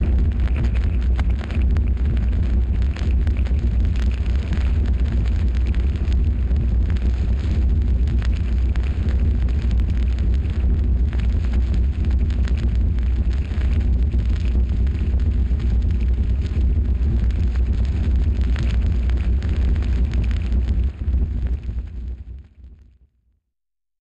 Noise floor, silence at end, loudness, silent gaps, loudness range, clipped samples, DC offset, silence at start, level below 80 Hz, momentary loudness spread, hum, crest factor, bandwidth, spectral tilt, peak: -84 dBFS; 1.25 s; -21 LUFS; none; 1 LU; under 0.1%; under 0.1%; 0 s; -20 dBFS; 2 LU; none; 6 dB; 5.2 kHz; -8.5 dB/octave; -12 dBFS